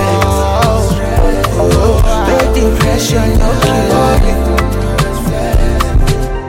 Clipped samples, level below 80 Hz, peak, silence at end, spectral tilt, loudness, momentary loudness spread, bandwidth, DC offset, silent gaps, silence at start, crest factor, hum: under 0.1%; -14 dBFS; 0 dBFS; 0 s; -5.5 dB/octave; -12 LUFS; 4 LU; 16.5 kHz; under 0.1%; none; 0 s; 10 dB; none